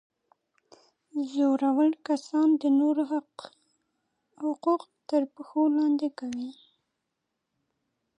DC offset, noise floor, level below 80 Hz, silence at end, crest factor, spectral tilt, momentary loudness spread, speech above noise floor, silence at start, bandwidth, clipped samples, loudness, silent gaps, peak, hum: under 0.1%; -83 dBFS; -82 dBFS; 1.65 s; 16 dB; -5 dB/octave; 12 LU; 57 dB; 1.15 s; 9.6 kHz; under 0.1%; -27 LUFS; none; -14 dBFS; none